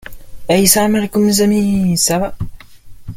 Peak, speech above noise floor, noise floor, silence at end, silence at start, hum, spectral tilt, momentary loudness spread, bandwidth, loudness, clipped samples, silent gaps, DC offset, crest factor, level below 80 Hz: 0 dBFS; 21 dB; -34 dBFS; 0 s; 0.05 s; none; -4 dB/octave; 17 LU; 17 kHz; -13 LUFS; under 0.1%; none; under 0.1%; 14 dB; -36 dBFS